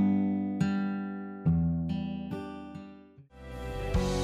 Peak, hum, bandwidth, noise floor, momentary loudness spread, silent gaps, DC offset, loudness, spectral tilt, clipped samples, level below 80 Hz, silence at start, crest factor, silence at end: -16 dBFS; none; 12 kHz; -52 dBFS; 17 LU; none; under 0.1%; -32 LUFS; -7.5 dB/octave; under 0.1%; -42 dBFS; 0 s; 14 dB; 0 s